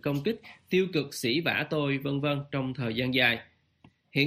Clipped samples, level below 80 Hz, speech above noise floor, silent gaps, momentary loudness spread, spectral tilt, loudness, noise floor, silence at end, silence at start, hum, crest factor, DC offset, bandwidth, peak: under 0.1%; -64 dBFS; 33 dB; none; 9 LU; -5.5 dB/octave; -28 LUFS; -62 dBFS; 0 s; 0.05 s; none; 20 dB; under 0.1%; 15.5 kHz; -10 dBFS